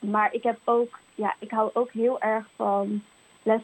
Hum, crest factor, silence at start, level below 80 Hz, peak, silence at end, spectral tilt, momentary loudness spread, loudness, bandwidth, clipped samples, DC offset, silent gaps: none; 16 dB; 0 s; -78 dBFS; -10 dBFS; 0 s; -7 dB/octave; 7 LU; -27 LUFS; 8.6 kHz; under 0.1%; under 0.1%; none